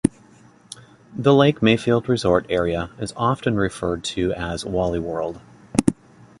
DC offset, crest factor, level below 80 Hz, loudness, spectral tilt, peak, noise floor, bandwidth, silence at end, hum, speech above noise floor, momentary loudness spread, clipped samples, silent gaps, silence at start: under 0.1%; 20 dB; -44 dBFS; -21 LUFS; -6 dB/octave; 0 dBFS; -51 dBFS; 11.5 kHz; 0.45 s; none; 30 dB; 22 LU; under 0.1%; none; 0.05 s